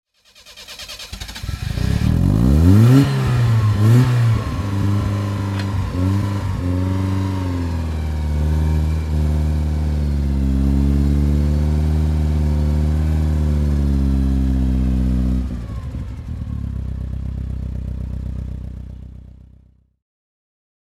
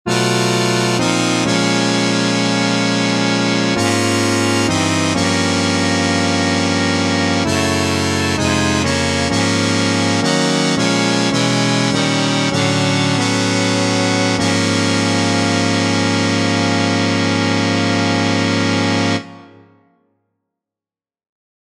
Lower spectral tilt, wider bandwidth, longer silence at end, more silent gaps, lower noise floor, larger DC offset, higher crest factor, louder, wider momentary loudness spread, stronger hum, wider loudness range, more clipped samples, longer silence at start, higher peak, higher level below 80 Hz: first, -7.5 dB/octave vs -4 dB/octave; about the same, 13.5 kHz vs 13.5 kHz; second, 1.55 s vs 2.3 s; neither; second, -50 dBFS vs under -90 dBFS; neither; about the same, 18 dB vs 16 dB; second, -19 LUFS vs -15 LUFS; first, 15 LU vs 1 LU; neither; first, 13 LU vs 2 LU; neither; first, 0.45 s vs 0.05 s; about the same, 0 dBFS vs 0 dBFS; first, -22 dBFS vs -46 dBFS